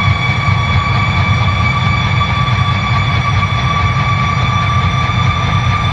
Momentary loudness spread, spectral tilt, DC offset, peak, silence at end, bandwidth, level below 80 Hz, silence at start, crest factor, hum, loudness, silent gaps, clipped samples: 1 LU; -5.5 dB/octave; under 0.1%; 0 dBFS; 0 s; 8.4 kHz; -26 dBFS; 0 s; 12 dB; none; -13 LUFS; none; under 0.1%